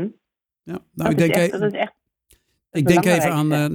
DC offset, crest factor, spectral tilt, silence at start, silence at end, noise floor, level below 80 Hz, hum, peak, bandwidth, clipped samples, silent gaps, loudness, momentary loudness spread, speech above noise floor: under 0.1%; 20 dB; -6 dB/octave; 0 s; 0 s; -75 dBFS; -54 dBFS; none; -2 dBFS; over 20 kHz; under 0.1%; none; -19 LUFS; 17 LU; 56 dB